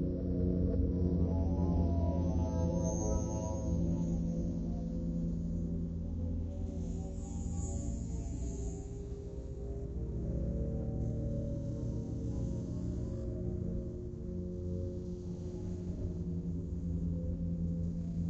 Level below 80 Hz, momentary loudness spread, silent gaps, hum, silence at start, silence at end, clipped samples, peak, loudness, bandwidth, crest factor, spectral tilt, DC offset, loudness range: -40 dBFS; 9 LU; none; none; 0 s; 0 s; under 0.1%; -20 dBFS; -37 LUFS; 8.2 kHz; 16 dB; -9 dB/octave; under 0.1%; 7 LU